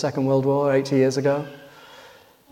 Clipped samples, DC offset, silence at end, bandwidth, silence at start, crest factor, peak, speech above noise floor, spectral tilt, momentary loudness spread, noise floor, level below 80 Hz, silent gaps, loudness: under 0.1%; under 0.1%; 0.45 s; 15 kHz; 0 s; 16 dB; -8 dBFS; 29 dB; -7 dB/octave; 7 LU; -50 dBFS; -66 dBFS; none; -21 LUFS